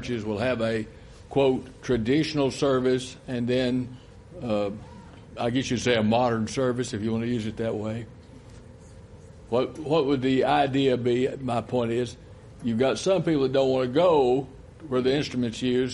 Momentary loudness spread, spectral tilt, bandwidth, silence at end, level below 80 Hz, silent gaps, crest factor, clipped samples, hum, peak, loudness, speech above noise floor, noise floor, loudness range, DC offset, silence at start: 11 LU; -6 dB/octave; 11.5 kHz; 0 s; -52 dBFS; none; 18 dB; under 0.1%; none; -8 dBFS; -25 LUFS; 22 dB; -46 dBFS; 4 LU; under 0.1%; 0 s